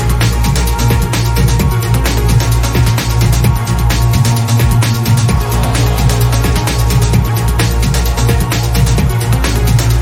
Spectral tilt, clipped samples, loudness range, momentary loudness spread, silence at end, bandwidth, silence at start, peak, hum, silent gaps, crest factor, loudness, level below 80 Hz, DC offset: -5 dB/octave; under 0.1%; 1 LU; 2 LU; 0 s; 16.5 kHz; 0 s; 0 dBFS; none; none; 10 dB; -12 LUFS; -16 dBFS; under 0.1%